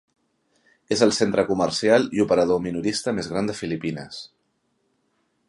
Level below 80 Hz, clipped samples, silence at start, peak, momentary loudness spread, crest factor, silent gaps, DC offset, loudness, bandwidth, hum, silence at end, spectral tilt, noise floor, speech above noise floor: -56 dBFS; under 0.1%; 0.9 s; -4 dBFS; 11 LU; 20 dB; none; under 0.1%; -22 LUFS; 11.5 kHz; none; 1.25 s; -4.5 dB/octave; -71 dBFS; 49 dB